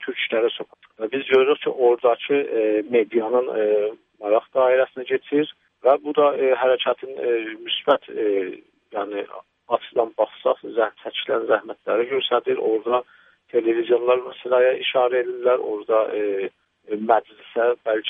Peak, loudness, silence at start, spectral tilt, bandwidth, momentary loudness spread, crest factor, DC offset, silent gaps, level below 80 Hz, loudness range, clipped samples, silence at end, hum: -2 dBFS; -22 LUFS; 0 s; -7 dB/octave; 3.8 kHz; 10 LU; 18 dB; under 0.1%; none; -78 dBFS; 4 LU; under 0.1%; 0 s; none